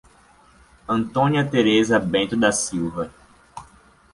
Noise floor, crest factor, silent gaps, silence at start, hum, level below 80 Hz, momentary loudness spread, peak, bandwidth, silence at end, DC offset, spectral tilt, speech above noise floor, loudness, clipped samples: -53 dBFS; 18 dB; none; 0.9 s; none; -52 dBFS; 24 LU; -4 dBFS; 11.5 kHz; 0.5 s; under 0.1%; -4.5 dB/octave; 33 dB; -20 LUFS; under 0.1%